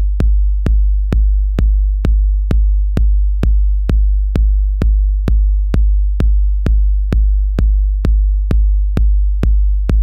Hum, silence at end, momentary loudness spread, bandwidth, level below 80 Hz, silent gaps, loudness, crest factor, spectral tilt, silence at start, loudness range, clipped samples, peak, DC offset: none; 0 s; 1 LU; 3 kHz; -12 dBFS; none; -16 LUFS; 10 dB; -9 dB/octave; 0 s; 0 LU; under 0.1%; -2 dBFS; under 0.1%